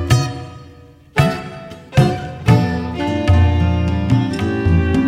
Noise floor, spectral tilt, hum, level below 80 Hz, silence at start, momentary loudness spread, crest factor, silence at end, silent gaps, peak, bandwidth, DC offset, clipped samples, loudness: -42 dBFS; -7 dB/octave; none; -28 dBFS; 0 s; 12 LU; 14 dB; 0 s; none; -2 dBFS; 13.5 kHz; under 0.1%; under 0.1%; -17 LUFS